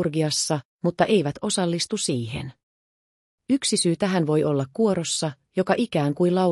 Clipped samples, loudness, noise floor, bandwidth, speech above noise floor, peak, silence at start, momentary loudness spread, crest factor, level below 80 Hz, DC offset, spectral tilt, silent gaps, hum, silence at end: under 0.1%; -23 LUFS; under -90 dBFS; 13.5 kHz; over 67 dB; -6 dBFS; 0 s; 7 LU; 18 dB; -60 dBFS; under 0.1%; -4.5 dB/octave; 0.65-0.79 s, 2.63-3.38 s; none; 0 s